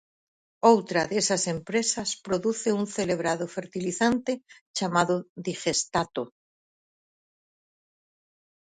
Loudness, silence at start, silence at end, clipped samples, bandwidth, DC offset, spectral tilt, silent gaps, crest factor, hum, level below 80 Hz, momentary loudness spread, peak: -26 LUFS; 0.65 s; 2.4 s; under 0.1%; 9.6 kHz; under 0.1%; -3.5 dB/octave; 4.61-4.74 s, 5.29-5.36 s; 24 dB; none; -64 dBFS; 10 LU; -4 dBFS